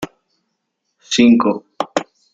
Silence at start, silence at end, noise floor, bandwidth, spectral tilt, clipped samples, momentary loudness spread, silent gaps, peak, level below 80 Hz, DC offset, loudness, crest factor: 0 s; 0.3 s; -73 dBFS; 7.8 kHz; -4 dB/octave; under 0.1%; 13 LU; none; -2 dBFS; -58 dBFS; under 0.1%; -16 LUFS; 16 dB